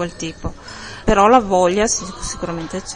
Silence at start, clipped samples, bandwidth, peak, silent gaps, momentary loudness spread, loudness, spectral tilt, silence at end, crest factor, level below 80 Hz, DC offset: 0 s; under 0.1%; 10.5 kHz; 0 dBFS; none; 18 LU; -17 LUFS; -4 dB/octave; 0 s; 18 dB; -34 dBFS; under 0.1%